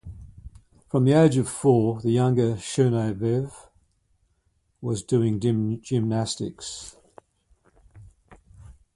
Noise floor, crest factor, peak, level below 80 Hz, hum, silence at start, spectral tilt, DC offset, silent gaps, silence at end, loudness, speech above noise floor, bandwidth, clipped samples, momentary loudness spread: -69 dBFS; 20 dB; -6 dBFS; -52 dBFS; none; 0.05 s; -7 dB/octave; under 0.1%; none; 0.25 s; -23 LUFS; 47 dB; 11.5 kHz; under 0.1%; 16 LU